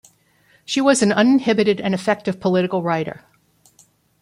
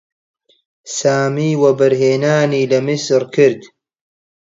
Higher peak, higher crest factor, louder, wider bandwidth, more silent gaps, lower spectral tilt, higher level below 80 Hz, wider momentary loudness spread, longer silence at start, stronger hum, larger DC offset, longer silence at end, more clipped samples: about the same, -2 dBFS vs 0 dBFS; about the same, 18 dB vs 16 dB; second, -18 LUFS vs -15 LUFS; first, 12 kHz vs 7.8 kHz; neither; about the same, -5 dB/octave vs -5.5 dB/octave; about the same, -62 dBFS vs -64 dBFS; first, 8 LU vs 4 LU; second, 0.7 s vs 0.85 s; neither; neither; first, 1.1 s vs 0.8 s; neither